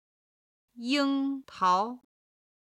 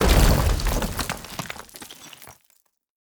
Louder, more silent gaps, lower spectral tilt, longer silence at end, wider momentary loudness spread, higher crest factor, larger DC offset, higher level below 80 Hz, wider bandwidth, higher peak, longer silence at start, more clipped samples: second, -28 LUFS vs -24 LUFS; neither; about the same, -4 dB/octave vs -4.5 dB/octave; about the same, 0.8 s vs 0.7 s; second, 13 LU vs 23 LU; about the same, 18 dB vs 20 dB; neither; second, -78 dBFS vs -26 dBFS; second, 10.5 kHz vs over 20 kHz; second, -14 dBFS vs -4 dBFS; first, 0.75 s vs 0 s; neither